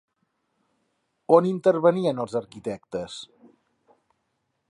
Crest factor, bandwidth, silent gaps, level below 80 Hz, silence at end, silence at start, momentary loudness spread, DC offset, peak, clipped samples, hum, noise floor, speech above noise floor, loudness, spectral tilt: 22 dB; 10.5 kHz; none; -68 dBFS; 1.45 s; 1.3 s; 17 LU; under 0.1%; -4 dBFS; under 0.1%; none; -76 dBFS; 53 dB; -23 LUFS; -7 dB/octave